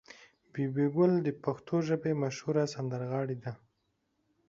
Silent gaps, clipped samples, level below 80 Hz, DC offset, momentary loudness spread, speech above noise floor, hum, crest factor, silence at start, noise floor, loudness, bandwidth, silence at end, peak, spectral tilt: none; under 0.1%; -72 dBFS; under 0.1%; 12 LU; 47 dB; none; 18 dB; 0.1 s; -78 dBFS; -32 LUFS; 7.8 kHz; 0.9 s; -14 dBFS; -7.5 dB/octave